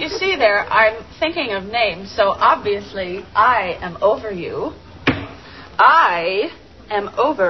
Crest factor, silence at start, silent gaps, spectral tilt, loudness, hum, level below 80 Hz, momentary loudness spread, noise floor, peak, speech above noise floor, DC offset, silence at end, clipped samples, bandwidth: 18 dB; 0 s; none; -5 dB/octave; -17 LUFS; none; -46 dBFS; 13 LU; -38 dBFS; 0 dBFS; 20 dB; 0.2%; 0 s; under 0.1%; 6.2 kHz